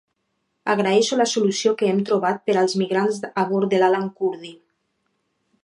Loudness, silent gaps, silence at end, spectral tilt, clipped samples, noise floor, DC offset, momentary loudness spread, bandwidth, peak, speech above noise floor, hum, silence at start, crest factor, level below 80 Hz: -21 LUFS; none; 1.1 s; -4.5 dB/octave; under 0.1%; -73 dBFS; under 0.1%; 8 LU; 11 kHz; -4 dBFS; 53 dB; none; 0.65 s; 18 dB; -74 dBFS